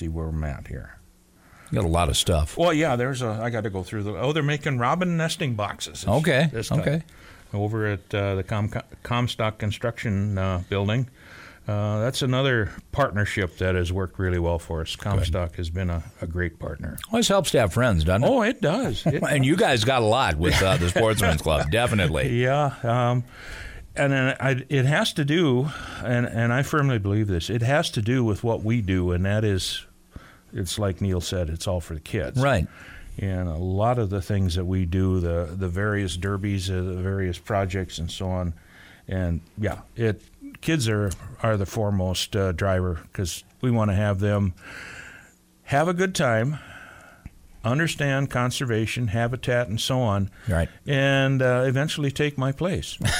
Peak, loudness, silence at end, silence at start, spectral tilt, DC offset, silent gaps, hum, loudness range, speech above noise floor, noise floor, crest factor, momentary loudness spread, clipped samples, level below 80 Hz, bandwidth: -10 dBFS; -24 LUFS; 0 s; 0 s; -5.5 dB/octave; under 0.1%; none; none; 6 LU; 31 dB; -55 dBFS; 14 dB; 10 LU; under 0.1%; -40 dBFS; 16 kHz